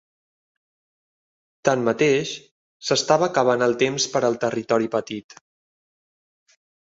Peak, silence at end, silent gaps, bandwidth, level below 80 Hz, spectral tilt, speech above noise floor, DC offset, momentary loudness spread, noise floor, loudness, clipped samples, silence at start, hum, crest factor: -2 dBFS; 1.6 s; 2.51-2.80 s; 8 kHz; -66 dBFS; -4 dB/octave; over 69 dB; under 0.1%; 13 LU; under -90 dBFS; -21 LUFS; under 0.1%; 1.65 s; none; 22 dB